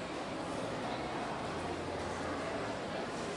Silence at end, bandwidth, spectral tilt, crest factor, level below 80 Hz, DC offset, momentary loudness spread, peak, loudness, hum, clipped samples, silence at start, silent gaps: 0 s; 11.5 kHz; -5 dB/octave; 14 dB; -60 dBFS; under 0.1%; 1 LU; -26 dBFS; -39 LUFS; none; under 0.1%; 0 s; none